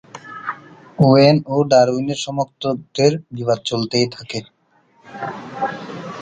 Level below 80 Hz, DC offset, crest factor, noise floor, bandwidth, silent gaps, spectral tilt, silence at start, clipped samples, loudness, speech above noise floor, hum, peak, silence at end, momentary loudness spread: -56 dBFS; under 0.1%; 18 dB; -56 dBFS; 9.4 kHz; none; -6 dB/octave; 0.15 s; under 0.1%; -18 LUFS; 39 dB; none; 0 dBFS; 0 s; 17 LU